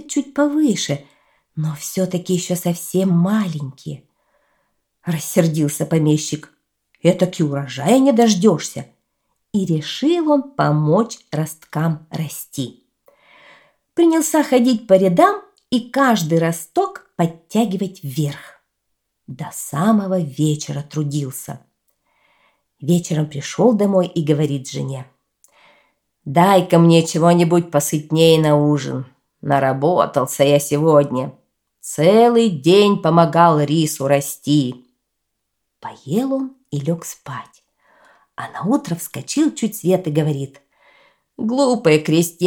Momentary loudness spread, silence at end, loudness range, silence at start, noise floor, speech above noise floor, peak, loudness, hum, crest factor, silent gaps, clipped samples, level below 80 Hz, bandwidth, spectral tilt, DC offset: 15 LU; 0 s; 8 LU; 0 s; -75 dBFS; 58 dB; 0 dBFS; -17 LUFS; none; 18 dB; none; under 0.1%; -64 dBFS; 18.5 kHz; -6 dB/octave; under 0.1%